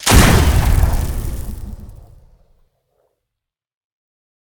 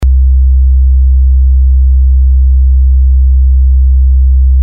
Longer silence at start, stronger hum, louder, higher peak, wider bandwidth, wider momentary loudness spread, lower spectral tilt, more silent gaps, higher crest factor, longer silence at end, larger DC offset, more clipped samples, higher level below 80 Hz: about the same, 0 s vs 0 s; neither; second, -15 LUFS vs -8 LUFS; about the same, 0 dBFS vs -2 dBFS; first, over 20 kHz vs 0.4 kHz; first, 23 LU vs 0 LU; second, -4.5 dB/octave vs -10 dB/octave; neither; first, 18 dB vs 4 dB; first, 2.55 s vs 0 s; second, under 0.1% vs 5%; neither; second, -20 dBFS vs -6 dBFS